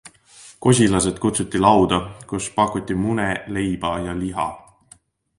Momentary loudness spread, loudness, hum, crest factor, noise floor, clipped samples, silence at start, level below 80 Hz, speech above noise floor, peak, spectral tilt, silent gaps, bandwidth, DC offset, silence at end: 10 LU; -20 LUFS; none; 20 dB; -53 dBFS; under 0.1%; 0.05 s; -44 dBFS; 33 dB; 0 dBFS; -5 dB/octave; none; 11.5 kHz; under 0.1%; 0.8 s